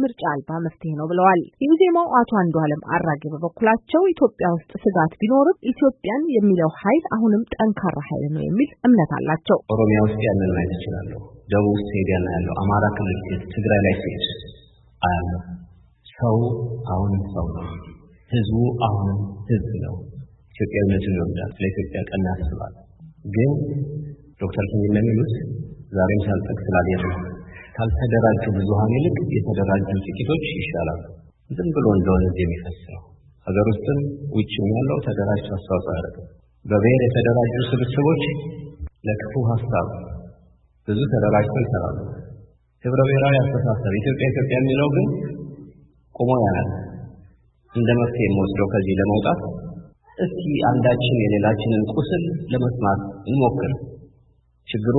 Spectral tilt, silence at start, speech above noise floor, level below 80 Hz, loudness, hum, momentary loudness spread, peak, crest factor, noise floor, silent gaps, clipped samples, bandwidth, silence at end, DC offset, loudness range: -12.5 dB/octave; 0 s; 38 dB; -40 dBFS; -21 LUFS; none; 14 LU; -4 dBFS; 18 dB; -58 dBFS; none; under 0.1%; 4.1 kHz; 0 s; under 0.1%; 5 LU